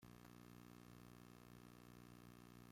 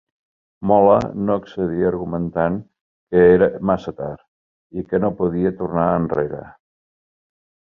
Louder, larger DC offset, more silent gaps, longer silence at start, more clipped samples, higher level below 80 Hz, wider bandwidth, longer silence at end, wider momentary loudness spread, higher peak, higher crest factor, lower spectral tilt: second, -63 LUFS vs -19 LUFS; neither; second, none vs 2.81-3.07 s, 4.28-4.70 s; second, 0 s vs 0.6 s; neither; second, -76 dBFS vs -46 dBFS; first, 16.5 kHz vs 6.6 kHz; second, 0 s vs 1.25 s; second, 1 LU vs 16 LU; second, -48 dBFS vs -2 dBFS; about the same, 16 dB vs 18 dB; second, -5.5 dB/octave vs -9.5 dB/octave